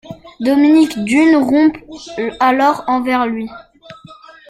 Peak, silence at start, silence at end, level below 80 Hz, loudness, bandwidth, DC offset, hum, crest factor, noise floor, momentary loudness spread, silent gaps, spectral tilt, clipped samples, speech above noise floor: -2 dBFS; 0.05 s; 0.35 s; -52 dBFS; -13 LUFS; 13.5 kHz; under 0.1%; none; 14 dB; -40 dBFS; 14 LU; none; -5 dB/octave; under 0.1%; 27 dB